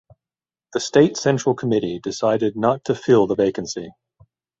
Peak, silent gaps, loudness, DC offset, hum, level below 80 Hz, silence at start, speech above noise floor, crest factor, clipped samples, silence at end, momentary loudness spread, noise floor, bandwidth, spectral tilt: -2 dBFS; none; -20 LUFS; under 0.1%; none; -58 dBFS; 0.75 s; over 71 dB; 18 dB; under 0.1%; 0.7 s; 12 LU; under -90 dBFS; 8 kHz; -5.5 dB/octave